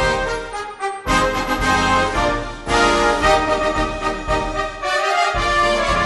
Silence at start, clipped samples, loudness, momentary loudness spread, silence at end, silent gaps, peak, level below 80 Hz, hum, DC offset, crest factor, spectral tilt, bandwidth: 0 s; under 0.1%; -18 LUFS; 9 LU; 0 s; none; -2 dBFS; -30 dBFS; none; under 0.1%; 16 dB; -3.5 dB/octave; 12 kHz